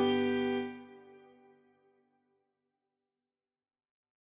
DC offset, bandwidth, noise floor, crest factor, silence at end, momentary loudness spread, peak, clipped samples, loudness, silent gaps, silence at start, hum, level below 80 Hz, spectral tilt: under 0.1%; 4 kHz; under -90 dBFS; 18 dB; 3.1 s; 24 LU; -20 dBFS; under 0.1%; -33 LUFS; none; 0 s; none; -74 dBFS; -3 dB/octave